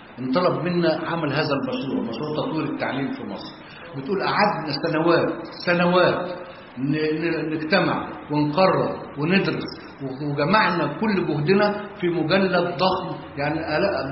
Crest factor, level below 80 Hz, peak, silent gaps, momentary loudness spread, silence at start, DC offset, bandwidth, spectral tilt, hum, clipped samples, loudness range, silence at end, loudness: 20 dB; -54 dBFS; -4 dBFS; none; 12 LU; 0 s; under 0.1%; 5.8 kHz; -10.5 dB/octave; none; under 0.1%; 4 LU; 0 s; -22 LUFS